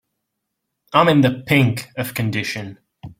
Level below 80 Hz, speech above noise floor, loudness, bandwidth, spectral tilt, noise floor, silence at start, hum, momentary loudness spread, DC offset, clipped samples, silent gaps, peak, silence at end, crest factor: -54 dBFS; 60 dB; -18 LUFS; 16.5 kHz; -6 dB/octave; -77 dBFS; 0.9 s; none; 12 LU; under 0.1%; under 0.1%; none; -2 dBFS; 0.05 s; 18 dB